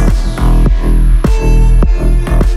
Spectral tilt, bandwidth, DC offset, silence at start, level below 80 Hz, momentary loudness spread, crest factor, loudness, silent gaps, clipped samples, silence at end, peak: -7.5 dB/octave; 12 kHz; under 0.1%; 0 s; -8 dBFS; 3 LU; 8 dB; -12 LUFS; none; under 0.1%; 0 s; 0 dBFS